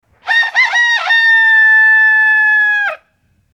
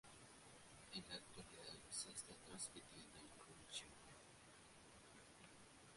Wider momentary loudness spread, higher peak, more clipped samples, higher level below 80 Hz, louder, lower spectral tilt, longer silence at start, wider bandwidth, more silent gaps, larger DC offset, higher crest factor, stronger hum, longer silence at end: second, 7 LU vs 13 LU; first, -2 dBFS vs -36 dBFS; neither; first, -68 dBFS vs -78 dBFS; first, -8 LUFS vs -56 LUFS; second, 2.5 dB/octave vs -1.5 dB/octave; first, 0.25 s vs 0.05 s; second, 9.4 kHz vs 11.5 kHz; neither; neither; second, 10 dB vs 22 dB; neither; first, 0.6 s vs 0 s